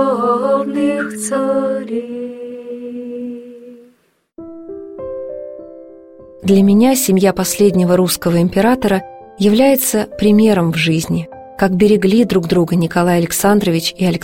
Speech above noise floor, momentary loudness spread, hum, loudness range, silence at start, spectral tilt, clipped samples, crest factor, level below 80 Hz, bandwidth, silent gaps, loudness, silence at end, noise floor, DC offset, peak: 43 dB; 17 LU; none; 16 LU; 0 s; -5.5 dB/octave; under 0.1%; 14 dB; -46 dBFS; 16.5 kHz; none; -14 LUFS; 0 s; -56 dBFS; under 0.1%; -2 dBFS